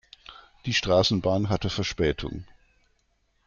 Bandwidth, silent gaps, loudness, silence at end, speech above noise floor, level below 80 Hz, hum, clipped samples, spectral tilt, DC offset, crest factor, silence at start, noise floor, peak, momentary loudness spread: 7.4 kHz; none; -25 LUFS; 1 s; 45 dB; -46 dBFS; none; under 0.1%; -5 dB/octave; under 0.1%; 18 dB; 0.3 s; -70 dBFS; -8 dBFS; 19 LU